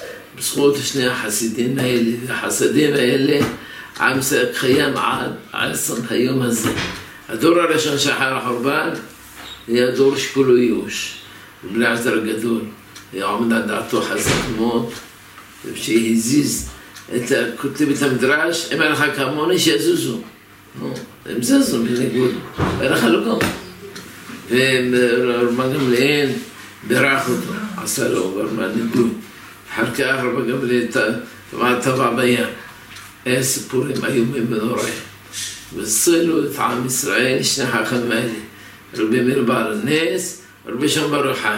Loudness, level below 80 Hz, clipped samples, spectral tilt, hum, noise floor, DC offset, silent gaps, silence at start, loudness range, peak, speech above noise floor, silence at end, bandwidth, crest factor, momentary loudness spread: -18 LUFS; -50 dBFS; under 0.1%; -4 dB/octave; none; -41 dBFS; under 0.1%; none; 0 s; 3 LU; -2 dBFS; 23 dB; 0 s; 16.5 kHz; 18 dB; 16 LU